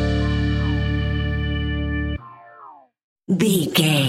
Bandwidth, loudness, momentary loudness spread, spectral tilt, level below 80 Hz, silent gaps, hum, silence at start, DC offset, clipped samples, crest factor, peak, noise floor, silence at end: 16.5 kHz; -21 LUFS; 11 LU; -5.5 dB/octave; -28 dBFS; 3.04-3.16 s; none; 0 s; under 0.1%; under 0.1%; 18 dB; -4 dBFS; -45 dBFS; 0 s